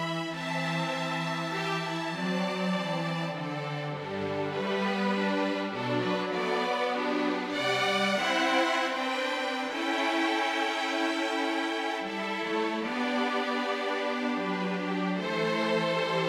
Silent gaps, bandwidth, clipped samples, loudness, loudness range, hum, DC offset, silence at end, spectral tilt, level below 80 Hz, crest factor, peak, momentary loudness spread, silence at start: none; 16 kHz; under 0.1%; -29 LUFS; 3 LU; none; under 0.1%; 0 s; -5 dB/octave; -78 dBFS; 18 dB; -12 dBFS; 6 LU; 0 s